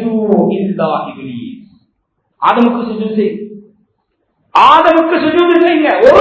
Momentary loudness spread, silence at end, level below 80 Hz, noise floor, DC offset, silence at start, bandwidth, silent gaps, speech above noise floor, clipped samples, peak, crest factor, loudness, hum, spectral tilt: 19 LU; 0 s; -52 dBFS; -65 dBFS; under 0.1%; 0 s; 8 kHz; none; 55 dB; 1%; 0 dBFS; 12 dB; -11 LUFS; none; -7 dB/octave